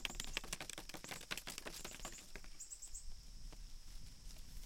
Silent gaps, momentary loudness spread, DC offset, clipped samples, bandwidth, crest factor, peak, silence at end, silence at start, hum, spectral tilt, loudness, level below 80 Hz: none; 13 LU; under 0.1%; under 0.1%; 16.5 kHz; 28 dB; -20 dBFS; 0 s; 0 s; none; -1.5 dB/octave; -50 LUFS; -54 dBFS